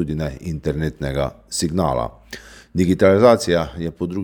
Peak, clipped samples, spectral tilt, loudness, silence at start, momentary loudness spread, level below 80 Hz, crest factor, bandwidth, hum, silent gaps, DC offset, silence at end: 0 dBFS; under 0.1%; -6 dB/octave; -19 LUFS; 0 s; 15 LU; -38 dBFS; 20 dB; 19 kHz; none; none; under 0.1%; 0 s